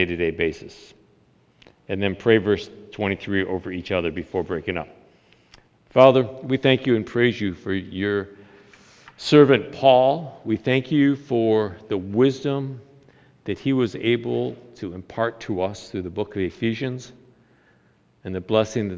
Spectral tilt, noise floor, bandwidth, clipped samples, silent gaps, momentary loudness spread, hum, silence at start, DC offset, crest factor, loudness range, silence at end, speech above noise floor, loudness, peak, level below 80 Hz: -6.5 dB/octave; -60 dBFS; 8 kHz; under 0.1%; none; 17 LU; none; 0 s; under 0.1%; 22 dB; 8 LU; 0 s; 38 dB; -22 LUFS; 0 dBFS; -50 dBFS